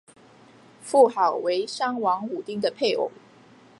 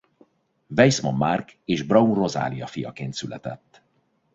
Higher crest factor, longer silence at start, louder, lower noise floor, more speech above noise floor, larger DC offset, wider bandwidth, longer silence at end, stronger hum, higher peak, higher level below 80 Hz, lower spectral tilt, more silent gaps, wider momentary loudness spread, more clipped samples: about the same, 20 dB vs 22 dB; first, 0.85 s vs 0.7 s; about the same, -24 LUFS vs -23 LUFS; second, -52 dBFS vs -68 dBFS; second, 29 dB vs 45 dB; neither; first, 11.5 kHz vs 8 kHz; about the same, 0.7 s vs 0.8 s; neither; second, -6 dBFS vs -2 dBFS; second, -78 dBFS vs -58 dBFS; second, -4 dB/octave vs -5.5 dB/octave; neither; second, 11 LU vs 15 LU; neither